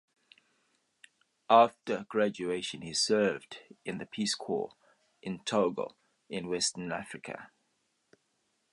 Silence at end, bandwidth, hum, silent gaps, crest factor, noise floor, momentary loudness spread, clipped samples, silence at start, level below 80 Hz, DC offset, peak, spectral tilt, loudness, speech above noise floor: 1.25 s; 11.5 kHz; none; none; 24 dB; -77 dBFS; 17 LU; under 0.1%; 1.5 s; -74 dBFS; under 0.1%; -8 dBFS; -3.5 dB/octave; -31 LUFS; 46 dB